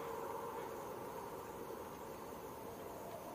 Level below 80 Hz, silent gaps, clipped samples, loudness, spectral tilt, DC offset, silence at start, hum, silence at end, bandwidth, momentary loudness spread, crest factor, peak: -72 dBFS; none; under 0.1%; -48 LUFS; -5 dB/octave; under 0.1%; 0 s; none; 0 s; 15.5 kHz; 4 LU; 14 dB; -34 dBFS